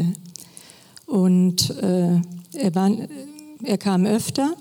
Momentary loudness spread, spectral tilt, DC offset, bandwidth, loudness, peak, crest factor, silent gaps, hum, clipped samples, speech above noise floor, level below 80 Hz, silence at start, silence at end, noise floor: 20 LU; -6 dB/octave; under 0.1%; 17.5 kHz; -21 LUFS; -6 dBFS; 14 dB; none; none; under 0.1%; 27 dB; -60 dBFS; 0 s; 0.05 s; -47 dBFS